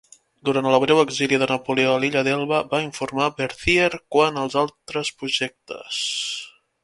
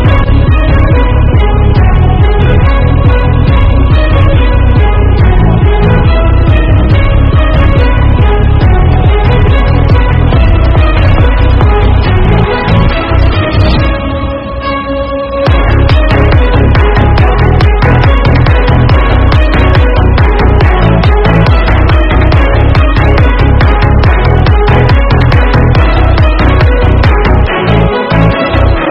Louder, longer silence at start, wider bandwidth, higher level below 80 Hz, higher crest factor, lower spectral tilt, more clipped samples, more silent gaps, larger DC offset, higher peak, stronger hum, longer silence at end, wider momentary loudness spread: second, -21 LUFS vs -7 LUFS; first, 0.45 s vs 0 s; first, 11.5 kHz vs 5.8 kHz; second, -50 dBFS vs -8 dBFS; first, 20 dB vs 6 dB; second, -4 dB/octave vs -9 dB/octave; second, under 0.1% vs 2%; neither; neither; about the same, -2 dBFS vs 0 dBFS; neither; first, 0.35 s vs 0 s; first, 10 LU vs 2 LU